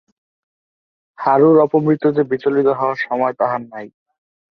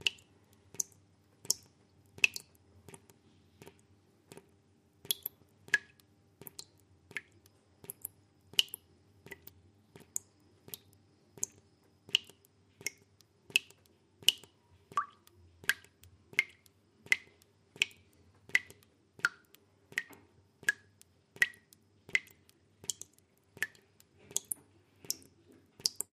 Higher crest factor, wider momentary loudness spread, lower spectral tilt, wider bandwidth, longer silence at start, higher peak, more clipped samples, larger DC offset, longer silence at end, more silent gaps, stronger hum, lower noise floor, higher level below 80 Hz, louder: second, 16 dB vs 34 dB; second, 12 LU vs 22 LU; first, -9.5 dB/octave vs 1 dB/octave; second, 5.8 kHz vs 15.5 kHz; first, 1.2 s vs 0.05 s; first, -2 dBFS vs -6 dBFS; neither; neither; first, 0.65 s vs 0.25 s; neither; neither; first, under -90 dBFS vs -68 dBFS; first, -64 dBFS vs -80 dBFS; first, -16 LUFS vs -35 LUFS